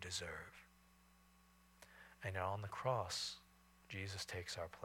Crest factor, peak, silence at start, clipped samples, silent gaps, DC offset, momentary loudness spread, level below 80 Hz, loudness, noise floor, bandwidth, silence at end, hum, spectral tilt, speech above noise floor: 22 dB; -26 dBFS; 0 s; under 0.1%; none; under 0.1%; 20 LU; -70 dBFS; -45 LUFS; -70 dBFS; 18 kHz; 0 s; none; -3 dB/octave; 25 dB